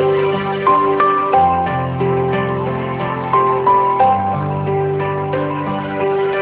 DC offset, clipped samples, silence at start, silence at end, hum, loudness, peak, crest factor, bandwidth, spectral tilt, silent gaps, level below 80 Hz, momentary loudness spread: under 0.1%; under 0.1%; 0 s; 0 s; none; -16 LUFS; -2 dBFS; 14 dB; 4 kHz; -11 dB/octave; none; -42 dBFS; 7 LU